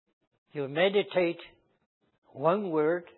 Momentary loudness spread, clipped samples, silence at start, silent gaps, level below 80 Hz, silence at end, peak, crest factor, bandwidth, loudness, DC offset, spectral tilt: 13 LU; under 0.1%; 0.55 s; 1.86-2.01 s, 2.18-2.22 s; -76 dBFS; 0.15 s; -10 dBFS; 20 dB; 4.2 kHz; -28 LUFS; under 0.1%; -9.5 dB/octave